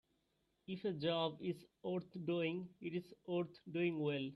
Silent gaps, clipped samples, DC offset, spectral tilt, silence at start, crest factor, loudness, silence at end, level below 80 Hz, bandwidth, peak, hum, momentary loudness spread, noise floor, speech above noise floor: none; under 0.1%; under 0.1%; -8 dB/octave; 0.7 s; 18 dB; -42 LUFS; 0 s; -82 dBFS; 12 kHz; -24 dBFS; none; 8 LU; -82 dBFS; 40 dB